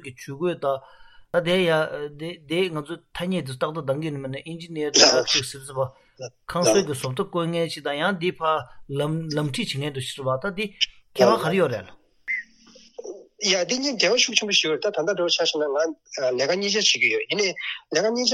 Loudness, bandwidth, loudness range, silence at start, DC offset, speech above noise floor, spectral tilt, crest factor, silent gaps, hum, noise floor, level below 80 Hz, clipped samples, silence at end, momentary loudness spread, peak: -23 LUFS; 15 kHz; 5 LU; 0.05 s; under 0.1%; 28 dB; -3 dB/octave; 22 dB; none; none; -52 dBFS; -60 dBFS; under 0.1%; 0 s; 14 LU; -2 dBFS